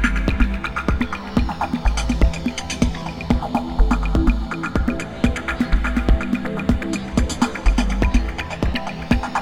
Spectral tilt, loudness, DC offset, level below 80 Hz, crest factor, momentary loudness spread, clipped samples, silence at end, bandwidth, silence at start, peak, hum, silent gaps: -6 dB/octave; -22 LUFS; under 0.1%; -22 dBFS; 18 dB; 4 LU; under 0.1%; 0 s; 11.5 kHz; 0 s; 0 dBFS; none; none